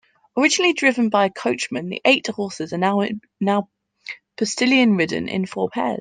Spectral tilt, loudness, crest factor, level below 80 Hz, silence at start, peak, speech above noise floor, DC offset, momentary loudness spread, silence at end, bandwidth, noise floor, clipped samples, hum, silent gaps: -4 dB/octave; -20 LUFS; 18 dB; -66 dBFS; 0.35 s; -2 dBFS; 19 dB; under 0.1%; 12 LU; 0 s; 9.8 kHz; -39 dBFS; under 0.1%; none; none